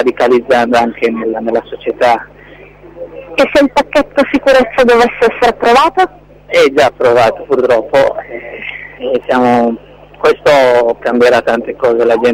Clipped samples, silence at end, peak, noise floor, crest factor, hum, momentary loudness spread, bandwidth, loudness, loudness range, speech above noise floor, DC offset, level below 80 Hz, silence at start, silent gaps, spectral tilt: under 0.1%; 0 s; 0 dBFS; -36 dBFS; 10 dB; 50 Hz at -45 dBFS; 12 LU; 15.5 kHz; -11 LUFS; 4 LU; 26 dB; under 0.1%; -42 dBFS; 0 s; none; -4.5 dB/octave